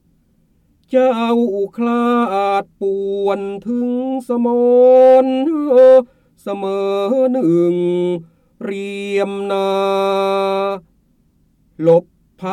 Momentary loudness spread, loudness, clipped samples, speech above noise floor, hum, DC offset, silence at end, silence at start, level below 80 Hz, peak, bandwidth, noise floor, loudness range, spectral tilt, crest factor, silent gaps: 14 LU; -15 LUFS; under 0.1%; 43 dB; none; under 0.1%; 0 s; 0.9 s; -60 dBFS; -2 dBFS; 9.6 kHz; -57 dBFS; 6 LU; -7 dB/octave; 14 dB; none